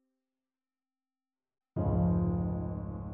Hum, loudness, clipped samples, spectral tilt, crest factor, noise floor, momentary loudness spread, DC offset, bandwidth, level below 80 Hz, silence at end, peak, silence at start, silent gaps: none; -32 LUFS; under 0.1%; -13.5 dB/octave; 16 dB; under -90 dBFS; 10 LU; under 0.1%; 2.2 kHz; -44 dBFS; 0 s; -18 dBFS; 1.75 s; none